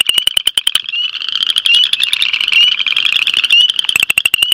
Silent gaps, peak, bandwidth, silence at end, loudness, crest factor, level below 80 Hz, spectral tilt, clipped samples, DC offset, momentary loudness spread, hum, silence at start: none; 0 dBFS; over 20 kHz; 0 s; -10 LUFS; 12 dB; -54 dBFS; 2.5 dB/octave; 0.3%; under 0.1%; 6 LU; none; 0 s